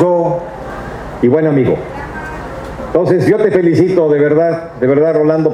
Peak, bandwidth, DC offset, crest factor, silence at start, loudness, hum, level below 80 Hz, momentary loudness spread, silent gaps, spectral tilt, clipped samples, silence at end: 0 dBFS; 11.5 kHz; under 0.1%; 12 dB; 0 s; -12 LUFS; none; -38 dBFS; 14 LU; none; -8.5 dB/octave; under 0.1%; 0 s